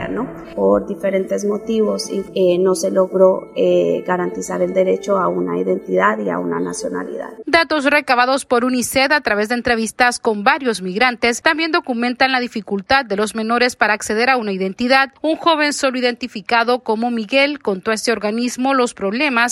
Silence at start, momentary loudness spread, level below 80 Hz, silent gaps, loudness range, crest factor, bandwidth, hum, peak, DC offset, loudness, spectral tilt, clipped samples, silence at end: 0 s; 6 LU; -52 dBFS; none; 2 LU; 18 dB; 15.5 kHz; none; 0 dBFS; under 0.1%; -17 LUFS; -4 dB/octave; under 0.1%; 0 s